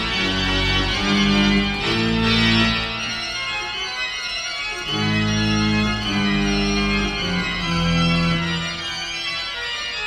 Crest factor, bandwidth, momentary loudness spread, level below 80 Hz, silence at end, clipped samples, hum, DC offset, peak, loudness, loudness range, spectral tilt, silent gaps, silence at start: 16 dB; 12 kHz; 7 LU; -34 dBFS; 0 s; under 0.1%; none; under 0.1%; -4 dBFS; -20 LUFS; 3 LU; -4.5 dB/octave; none; 0 s